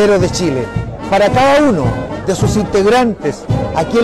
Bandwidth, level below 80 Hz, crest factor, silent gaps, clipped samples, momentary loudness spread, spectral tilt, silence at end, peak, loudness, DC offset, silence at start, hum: 13.5 kHz; -32 dBFS; 6 dB; none; under 0.1%; 9 LU; -6 dB/octave; 0 s; -6 dBFS; -13 LUFS; under 0.1%; 0 s; none